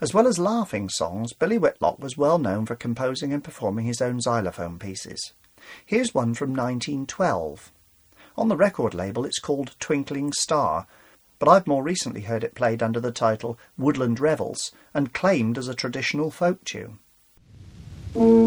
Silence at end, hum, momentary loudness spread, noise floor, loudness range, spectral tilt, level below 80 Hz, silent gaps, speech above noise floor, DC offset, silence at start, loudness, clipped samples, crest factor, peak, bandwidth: 0 s; none; 12 LU; -56 dBFS; 4 LU; -5 dB/octave; -56 dBFS; none; 33 dB; under 0.1%; 0 s; -24 LUFS; under 0.1%; 22 dB; -2 dBFS; over 20 kHz